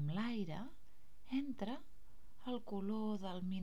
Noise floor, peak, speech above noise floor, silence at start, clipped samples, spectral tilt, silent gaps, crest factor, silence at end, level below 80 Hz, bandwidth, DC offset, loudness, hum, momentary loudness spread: -65 dBFS; -28 dBFS; 22 dB; 0 s; under 0.1%; -7.5 dB/octave; none; 16 dB; 0 s; -66 dBFS; 14 kHz; 0.6%; -44 LUFS; none; 10 LU